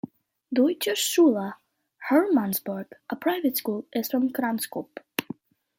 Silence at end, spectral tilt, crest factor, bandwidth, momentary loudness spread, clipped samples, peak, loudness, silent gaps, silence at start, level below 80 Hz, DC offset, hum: 0.55 s; -4 dB/octave; 20 dB; 16.5 kHz; 15 LU; under 0.1%; -6 dBFS; -25 LUFS; none; 0.05 s; -76 dBFS; under 0.1%; none